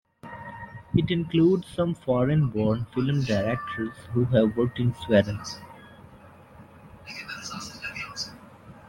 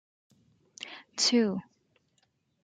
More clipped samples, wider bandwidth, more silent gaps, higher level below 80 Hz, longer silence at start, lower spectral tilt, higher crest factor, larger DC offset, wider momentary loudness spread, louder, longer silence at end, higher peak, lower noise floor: neither; first, 16.5 kHz vs 9.4 kHz; neither; first, -52 dBFS vs -82 dBFS; second, 0.25 s vs 0.8 s; first, -7 dB/octave vs -3 dB/octave; about the same, 20 dB vs 22 dB; neither; about the same, 18 LU vs 19 LU; about the same, -26 LUFS vs -28 LUFS; second, 0 s vs 1.05 s; first, -6 dBFS vs -12 dBFS; second, -50 dBFS vs -73 dBFS